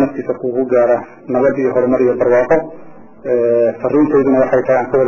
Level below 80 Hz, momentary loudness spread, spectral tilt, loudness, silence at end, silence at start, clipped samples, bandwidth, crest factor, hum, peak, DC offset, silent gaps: -50 dBFS; 7 LU; -9.5 dB/octave; -14 LUFS; 0 s; 0 s; under 0.1%; 6.8 kHz; 12 dB; none; -2 dBFS; under 0.1%; none